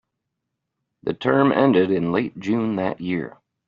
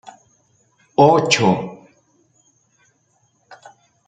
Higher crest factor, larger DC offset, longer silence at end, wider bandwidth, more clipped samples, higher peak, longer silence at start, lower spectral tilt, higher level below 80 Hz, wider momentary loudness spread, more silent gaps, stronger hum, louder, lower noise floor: about the same, 18 dB vs 20 dB; neither; second, 0.4 s vs 0.55 s; second, 7.2 kHz vs 9.4 kHz; neither; about the same, -4 dBFS vs -2 dBFS; about the same, 1.05 s vs 1 s; about the same, -5.5 dB/octave vs -4.5 dB/octave; about the same, -62 dBFS vs -62 dBFS; about the same, 12 LU vs 11 LU; neither; neither; second, -21 LUFS vs -15 LUFS; first, -80 dBFS vs -63 dBFS